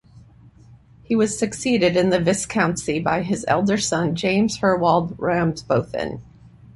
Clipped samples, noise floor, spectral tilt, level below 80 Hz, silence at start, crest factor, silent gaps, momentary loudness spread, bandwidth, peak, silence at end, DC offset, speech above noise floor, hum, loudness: under 0.1%; -48 dBFS; -5 dB/octave; -50 dBFS; 0.15 s; 18 dB; none; 5 LU; 11.5 kHz; -4 dBFS; 0.05 s; under 0.1%; 28 dB; none; -21 LUFS